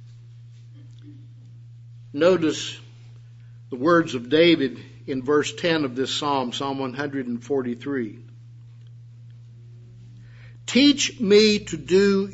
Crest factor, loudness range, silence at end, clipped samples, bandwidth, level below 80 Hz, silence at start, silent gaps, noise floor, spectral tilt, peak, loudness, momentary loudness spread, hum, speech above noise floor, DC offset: 20 dB; 9 LU; 0 s; under 0.1%; 8 kHz; -60 dBFS; 0 s; none; -44 dBFS; -4.5 dB/octave; -4 dBFS; -21 LUFS; 14 LU; none; 23 dB; under 0.1%